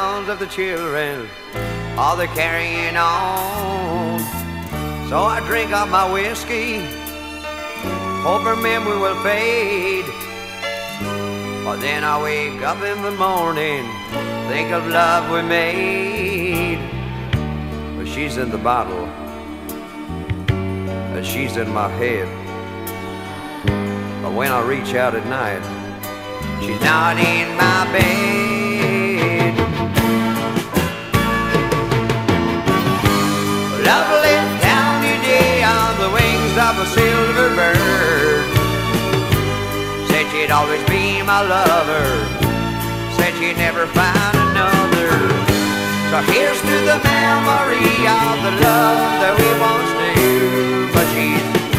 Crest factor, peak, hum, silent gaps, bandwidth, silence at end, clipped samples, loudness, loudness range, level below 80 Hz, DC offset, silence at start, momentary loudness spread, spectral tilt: 18 dB; 0 dBFS; none; none; 16 kHz; 0 s; under 0.1%; -17 LUFS; 8 LU; -36 dBFS; under 0.1%; 0 s; 12 LU; -5 dB/octave